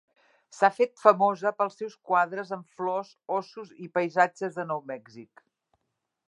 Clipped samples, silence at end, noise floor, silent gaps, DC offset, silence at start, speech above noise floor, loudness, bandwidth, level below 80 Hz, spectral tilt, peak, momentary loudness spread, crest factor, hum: under 0.1%; 1.05 s; -82 dBFS; none; under 0.1%; 0.55 s; 55 dB; -27 LUFS; 11 kHz; -86 dBFS; -5.5 dB/octave; -4 dBFS; 17 LU; 26 dB; none